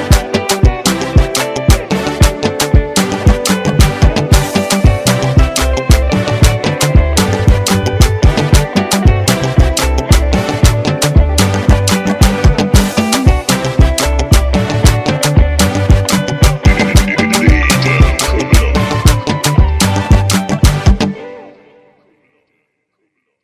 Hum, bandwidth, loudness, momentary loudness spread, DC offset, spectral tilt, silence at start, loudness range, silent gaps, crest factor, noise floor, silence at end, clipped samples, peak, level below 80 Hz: none; 16 kHz; -11 LUFS; 3 LU; under 0.1%; -5 dB/octave; 0 s; 2 LU; none; 10 dB; -66 dBFS; 1.95 s; 1%; 0 dBFS; -14 dBFS